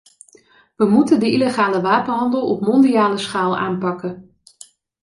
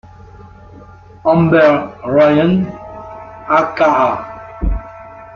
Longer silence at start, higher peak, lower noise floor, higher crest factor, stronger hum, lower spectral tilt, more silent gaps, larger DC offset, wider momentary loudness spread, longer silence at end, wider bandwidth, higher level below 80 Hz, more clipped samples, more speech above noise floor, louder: first, 0.8 s vs 0.4 s; about the same, -2 dBFS vs 0 dBFS; first, -52 dBFS vs -38 dBFS; about the same, 16 dB vs 14 dB; neither; second, -6 dB/octave vs -8 dB/octave; neither; neither; second, 9 LU vs 21 LU; first, 0.8 s vs 0 s; first, 11.5 kHz vs 6.8 kHz; second, -60 dBFS vs -30 dBFS; neither; first, 36 dB vs 26 dB; second, -17 LUFS vs -14 LUFS